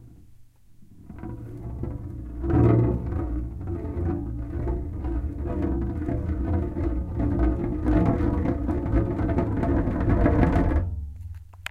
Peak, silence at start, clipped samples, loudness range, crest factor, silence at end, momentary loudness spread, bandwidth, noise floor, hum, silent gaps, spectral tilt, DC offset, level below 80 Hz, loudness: -4 dBFS; 0 s; under 0.1%; 5 LU; 20 dB; 0 s; 15 LU; 7.4 kHz; -49 dBFS; none; none; -10 dB/octave; under 0.1%; -30 dBFS; -26 LUFS